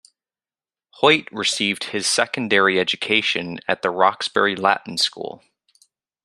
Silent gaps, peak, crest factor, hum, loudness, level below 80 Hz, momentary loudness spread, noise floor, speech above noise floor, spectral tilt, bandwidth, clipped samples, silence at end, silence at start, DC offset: none; 0 dBFS; 22 dB; none; -19 LUFS; -68 dBFS; 6 LU; under -90 dBFS; over 70 dB; -2.5 dB/octave; 13 kHz; under 0.1%; 0.9 s; 1 s; under 0.1%